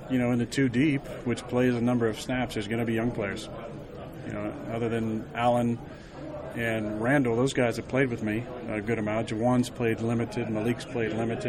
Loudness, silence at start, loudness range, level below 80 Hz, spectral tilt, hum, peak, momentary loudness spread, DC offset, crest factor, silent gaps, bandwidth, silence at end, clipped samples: -28 LUFS; 0 s; 4 LU; -52 dBFS; -6.5 dB/octave; none; -10 dBFS; 12 LU; under 0.1%; 18 dB; none; 14 kHz; 0 s; under 0.1%